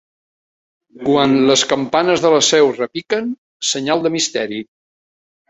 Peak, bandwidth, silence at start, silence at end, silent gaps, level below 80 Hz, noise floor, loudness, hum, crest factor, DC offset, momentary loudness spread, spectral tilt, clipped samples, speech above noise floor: -2 dBFS; 8.4 kHz; 0.95 s; 0.85 s; 3.38-3.60 s; -58 dBFS; under -90 dBFS; -15 LUFS; none; 16 dB; under 0.1%; 11 LU; -3 dB/octave; under 0.1%; over 75 dB